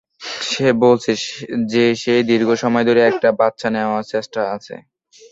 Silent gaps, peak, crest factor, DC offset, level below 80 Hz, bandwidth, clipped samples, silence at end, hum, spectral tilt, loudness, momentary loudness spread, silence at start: none; -2 dBFS; 16 dB; under 0.1%; -60 dBFS; 8 kHz; under 0.1%; 0.5 s; none; -5 dB/octave; -17 LUFS; 10 LU; 0.2 s